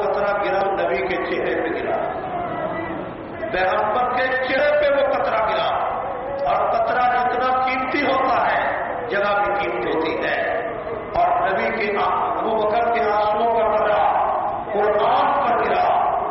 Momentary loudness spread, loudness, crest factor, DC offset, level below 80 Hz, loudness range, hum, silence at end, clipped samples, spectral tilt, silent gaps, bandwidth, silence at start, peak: 7 LU; -20 LUFS; 10 dB; under 0.1%; -48 dBFS; 4 LU; none; 0 s; under 0.1%; -2.5 dB/octave; none; 5.8 kHz; 0 s; -10 dBFS